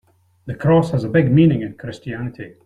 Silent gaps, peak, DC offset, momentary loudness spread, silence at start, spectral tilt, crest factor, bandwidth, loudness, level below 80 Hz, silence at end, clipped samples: none; -2 dBFS; under 0.1%; 16 LU; 0.45 s; -9 dB/octave; 16 dB; 9.4 kHz; -17 LUFS; -46 dBFS; 0.15 s; under 0.1%